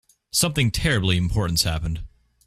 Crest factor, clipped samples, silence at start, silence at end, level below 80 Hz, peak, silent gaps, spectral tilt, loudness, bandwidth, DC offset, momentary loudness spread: 18 dB; under 0.1%; 0.35 s; 0.4 s; -34 dBFS; -6 dBFS; none; -4 dB/octave; -22 LUFS; 16 kHz; under 0.1%; 8 LU